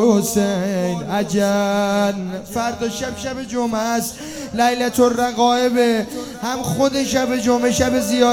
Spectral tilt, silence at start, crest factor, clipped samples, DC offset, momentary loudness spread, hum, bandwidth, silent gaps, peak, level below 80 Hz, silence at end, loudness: -4.5 dB/octave; 0 s; 16 dB; under 0.1%; under 0.1%; 9 LU; none; 18 kHz; none; -2 dBFS; -48 dBFS; 0 s; -19 LUFS